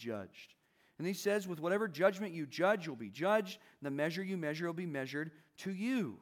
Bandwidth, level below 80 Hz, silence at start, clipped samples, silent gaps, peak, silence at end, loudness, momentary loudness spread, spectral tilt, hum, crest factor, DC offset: 19 kHz; under -90 dBFS; 0 s; under 0.1%; none; -18 dBFS; 0.05 s; -37 LUFS; 12 LU; -5.5 dB/octave; none; 20 dB; under 0.1%